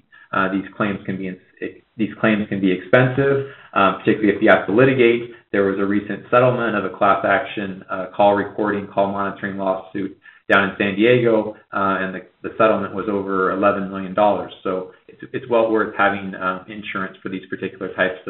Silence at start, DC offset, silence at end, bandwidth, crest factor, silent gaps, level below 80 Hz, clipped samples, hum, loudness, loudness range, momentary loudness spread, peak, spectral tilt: 0.3 s; under 0.1%; 0 s; 4.2 kHz; 20 dB; none; -60 dBFS; under 0.1%; none; -19 LUFS; 4 LU; 13 LU; 0 dBFS; -4.5 dB/octave